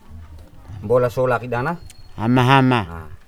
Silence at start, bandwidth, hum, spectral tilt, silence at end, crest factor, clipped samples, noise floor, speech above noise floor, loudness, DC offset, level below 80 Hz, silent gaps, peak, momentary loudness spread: 0.1 s; 13.5 kHz; none; -7 dB/octave; 0.1 s; 20 dB; under 0.1%; -39 dBFS; 21 dB; -18 LUFS; under 0.1%; -42 dBFS; none; 0 dBFS; 18 LU